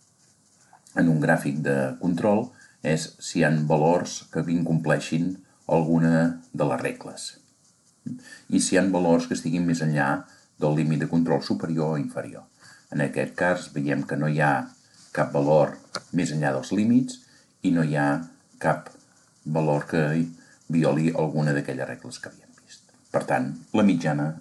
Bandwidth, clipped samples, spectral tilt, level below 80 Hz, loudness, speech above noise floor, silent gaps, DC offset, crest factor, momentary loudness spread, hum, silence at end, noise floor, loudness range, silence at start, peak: 12 kHz; under 0.1%; -6.5 dB/octave; -62 dBFS; -24 LUFS; 38 dB; none; under 0.1%; 18 dB; 13 LU; none; 0 s; -61 dBFS; 3 LU; 0.95 s; -8 dBFS